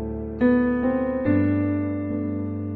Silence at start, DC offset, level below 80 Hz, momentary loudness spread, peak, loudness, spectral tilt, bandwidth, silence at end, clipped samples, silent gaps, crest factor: 0 s; under 0.1%; -42 dBFS; 7 LU; -8 dBFS; -23 LUFS; -12 dB/octave; 4.2 kHz; 0 s; under 0.1%; none; 14 dB